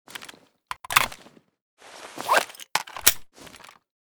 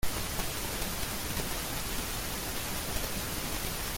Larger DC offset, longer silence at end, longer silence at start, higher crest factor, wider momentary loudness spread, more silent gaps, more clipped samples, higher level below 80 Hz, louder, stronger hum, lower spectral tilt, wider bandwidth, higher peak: neither; first, 0.6 s vs 0 s; about the same, 0.1 s vs 0 s; first, 28 dB vs 16 dB; first, 25 LU vs 1 LU; first, 1.62-1.77 s vs none; neither; second, -58 dBFS vs -42 dBFS; first, -23 LUFS vs -34 LUFS; neither; second, 0.5 dB/octave vs -2.5 dB/octave; first, over 20 kHz vs 17 kHz; first, 0 dBFS vs -16 dBFS